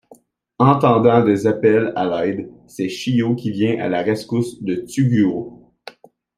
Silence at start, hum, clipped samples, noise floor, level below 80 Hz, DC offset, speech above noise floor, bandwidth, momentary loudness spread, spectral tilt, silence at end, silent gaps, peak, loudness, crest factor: 0.6 s; none; under 0.1%; -50 dBFS; -58 dBFS; under 0.1%; 33 dB; 14.5 kHz; 12 LU; -7.5 dB/octave; 0.85 s; none; -2 dBFS; -18 LUFS; 16 dB